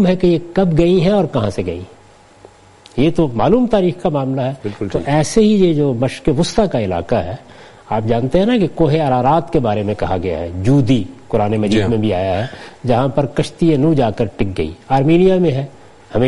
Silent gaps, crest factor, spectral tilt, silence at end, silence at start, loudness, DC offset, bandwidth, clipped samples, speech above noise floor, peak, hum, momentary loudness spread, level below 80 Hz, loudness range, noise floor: none; 14 dB; -7 dB/octave; 0 s; 0 s; -16 LUFS; under 0.1%; 11.5 kHz; under 0.1%; 29 dB; 0 dBFS; none; 9 LU; -34 dBFS; 2 LU; -44 dBFS